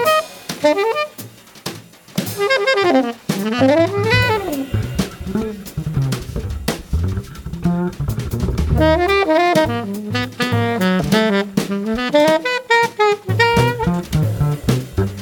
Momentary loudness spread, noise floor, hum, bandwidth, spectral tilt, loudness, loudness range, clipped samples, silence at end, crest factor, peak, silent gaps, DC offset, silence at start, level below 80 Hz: 11 LU; -37 dBFS; none; over 20 kHz; -5.5 dB/octave; -18 LUFS; 6 LU; under 0.1%; 0 s; 16 dB; -2 dBFS; none; under 0.1%; 0 s; -32 dBFS